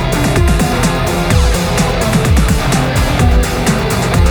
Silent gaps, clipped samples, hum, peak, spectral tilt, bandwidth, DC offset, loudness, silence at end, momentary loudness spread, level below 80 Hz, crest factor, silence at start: none; under 0.1%; none; 0 dBFS; -5 dB/octave; over 20 kHz; under 0.1%; -13 LUFS; 0 s; 2 LU; -16 dBFS; 10 dB; 0 s